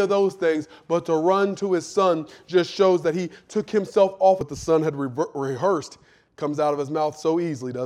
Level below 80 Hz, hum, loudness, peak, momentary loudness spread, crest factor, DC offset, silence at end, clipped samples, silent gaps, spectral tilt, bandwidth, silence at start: -60 dBFS; none; -23 LUFS; -6 dBFS; 9 LU; 16 dB; under 0.1%; 0 s; under 0.1%; none; -6 dB/octave; 11.5 kHz; 0 s